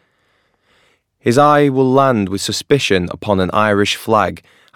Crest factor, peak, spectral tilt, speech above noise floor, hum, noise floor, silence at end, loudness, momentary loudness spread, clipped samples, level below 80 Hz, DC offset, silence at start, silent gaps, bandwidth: 16 dB; 0 dBFS; -5 dB/octave; 47 dB; none; -61 dBFS; 0.35 s; -14 LUFS; 7 LU; under 0.1%; -54 dBFS; under 0.1%; 1.25 s; none; 17 kHz